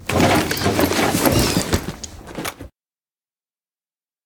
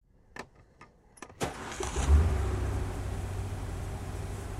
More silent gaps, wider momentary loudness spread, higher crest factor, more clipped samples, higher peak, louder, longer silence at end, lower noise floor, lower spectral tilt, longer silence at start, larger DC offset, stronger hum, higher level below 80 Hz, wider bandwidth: neither; second, 14 LU vs 22 LU; about the same, 22 dB vs 18 dB; neither; first, 0 dBFS vs -14 dBFS; first, -18 LUFS vs -33 LUFS; first, 1.6 s vs 0 s; first, under -90 dBFS vs -57 dBFS; second, -4 dB/octave vs -5.5 dB/octave; second, 0 s vs 0.35 s; neither; neither; about the same, -38 dBFS vs -34 dBFS; first, over 20 kHz vs 13 kHz